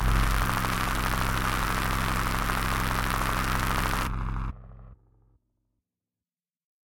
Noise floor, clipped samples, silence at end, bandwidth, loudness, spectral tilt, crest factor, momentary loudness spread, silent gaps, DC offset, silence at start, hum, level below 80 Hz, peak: under -90 dBFS; under 0.1%; 1.9 s; 17 kHz; -28 LUFS; -4 dB/octave; 18 dB; 6 LU; none; under 0.1%; 0 s; none; -32 dBFS; -10 dBFS